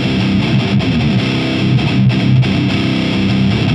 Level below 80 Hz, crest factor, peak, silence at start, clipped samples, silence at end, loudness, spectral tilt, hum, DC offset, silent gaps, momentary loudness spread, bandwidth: -34 dBFS; 10 dB; -2 dBFS; 0 s; under 0.1%; 0 s; -13 LUFS; -7 dB/octave; none; under 0.1%; none; 2 LU; 9.4 kHz